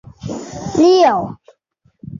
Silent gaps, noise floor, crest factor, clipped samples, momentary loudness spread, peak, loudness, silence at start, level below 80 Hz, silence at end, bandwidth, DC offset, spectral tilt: none; -60 dBFS; 14 dB; under 0.1%; 18 LU; -2 dBFS; -13 LUFS; 0.25 s; -48 dBFS; 0 s; 7.4 kHz; under 0.1%; -5.5 dB/octave